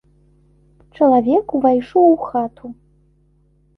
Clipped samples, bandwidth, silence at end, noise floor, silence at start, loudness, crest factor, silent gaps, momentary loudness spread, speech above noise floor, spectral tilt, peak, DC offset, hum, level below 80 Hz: under 0.1%; 5.6 kHz; 1.05 s; -57 dBFS; 1 s; -16 LUFS; 16 dB; none; 15 LU; 41 dB; -9 dB/octave; -2 dBFS; under 0.1%; 50 Hz at -50 dBFS; -54 dBFS